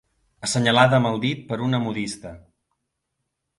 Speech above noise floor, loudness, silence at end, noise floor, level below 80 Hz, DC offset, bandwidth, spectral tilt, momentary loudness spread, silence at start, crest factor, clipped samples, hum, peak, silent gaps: 57 dB; -21 LUFS; 1.2 s; -78 dBFS; -56 dBFS; under 0.1%; 11.5 kHz; -5 dB/octave; 15 LU; 0.4 s; 22 dB; under 0.1%; none; -2 dBFS; none